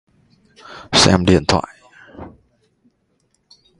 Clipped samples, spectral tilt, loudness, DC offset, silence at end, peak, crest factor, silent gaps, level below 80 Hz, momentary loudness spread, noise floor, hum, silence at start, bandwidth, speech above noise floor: under 0.1%; -4 dB/octave; -14 LUFS; under 0.1%; 1.5 s; 0 dBFS; 20 dB; none; -38 dBFS; 27 LU; -65 dBFS; none; 0.7 s; 11.5 kHz; 50 dB